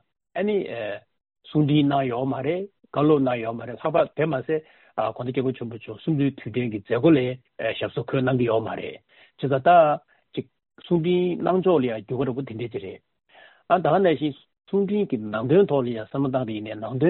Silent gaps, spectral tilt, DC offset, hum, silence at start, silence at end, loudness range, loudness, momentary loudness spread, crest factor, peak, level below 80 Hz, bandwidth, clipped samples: none; -6 dB/octave; under 0.1%; none; 0.35 s; 0 s; 3 LU; -24 LUFS; 13 LU; 18 dB; -6 dBFS; -62 dBFS; 4.3 kHz; under 0.1%